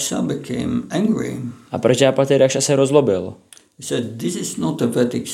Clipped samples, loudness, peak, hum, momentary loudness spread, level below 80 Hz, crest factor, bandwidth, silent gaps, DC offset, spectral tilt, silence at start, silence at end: under 0.1%; -19 LUFS; 0 dBFS; none; 11 LU; -58 dBFS; 18 dB; 16 kHz; none; under 0.1%; -5 dB/octave; 0 s; 0 s